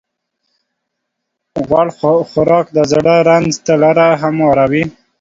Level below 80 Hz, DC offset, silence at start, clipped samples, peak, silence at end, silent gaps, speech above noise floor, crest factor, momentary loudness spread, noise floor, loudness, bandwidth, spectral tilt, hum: -46 dBFS; under 0.1%; 1.55 s; under 0.1%; 0 dBFS; 0.3 s; none; 63 dB; 12 dB; 6 LU; -74 dBFS; -12 LUFS; 7.8 kHz; -6 dB/octave; none